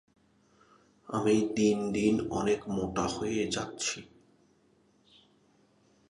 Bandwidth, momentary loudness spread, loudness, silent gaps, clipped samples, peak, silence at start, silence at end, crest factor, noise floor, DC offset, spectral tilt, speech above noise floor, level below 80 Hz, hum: 11.5 kHz; 7 LU; -30 LUFS; none; under 0.1%; -14 dBFS; 1.1 s; 2.05 s; 18 dB; -67 dBFS; under 0.1%; -4.5 dB/octave; 37 dB; -58 dBFS; none